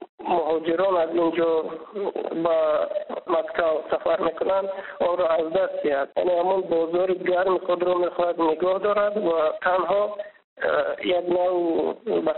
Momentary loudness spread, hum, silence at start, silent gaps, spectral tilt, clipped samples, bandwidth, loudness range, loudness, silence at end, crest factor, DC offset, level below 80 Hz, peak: 5 LU; none; 0 s; 0.09-0.18 s, 10.44-10.56 s; -3.5 dB/octave; under 0.1%; 4.2 kHz; 2 LU; -23 LUFS; 0 s; 16 dB; under 0.1%; -62 dBFS; -8 dBFS